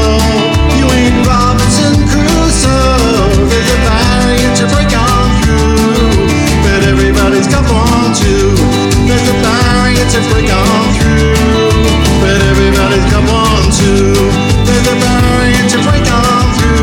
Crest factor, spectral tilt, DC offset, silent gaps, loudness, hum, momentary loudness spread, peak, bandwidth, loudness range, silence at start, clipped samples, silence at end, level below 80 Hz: 8 dB; -5 dB/octave; under 0.1%; none; -9 LUFS; none; 1 LU; 0 dBFS; 17.5 kHz; 0 LU; 0 s; under 0.1%; 0 s; -14 dBFS